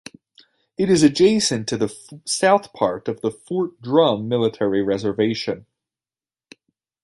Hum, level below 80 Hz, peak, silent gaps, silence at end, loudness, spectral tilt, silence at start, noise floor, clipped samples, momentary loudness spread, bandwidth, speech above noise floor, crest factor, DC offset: none; -58 dBFS; -2 dBFS; none; 1.45 s; -20 LUFS; -4.5 dB/octave; 0.8 s; under -90 dBFS; under 0.1%; 11 LU; 11.5 kHz; over 71 dB; 18 dB; under 0.1%